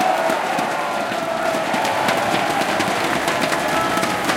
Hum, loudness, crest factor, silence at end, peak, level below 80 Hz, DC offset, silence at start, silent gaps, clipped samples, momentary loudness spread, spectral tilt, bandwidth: none; -19 LUFS; 16 dB; 0 s; -4 dBFS; -52 dBFS; under 0.1%; 0 s; none; under 0.1%; 3 LU; -3 dB/octave; 17 kHz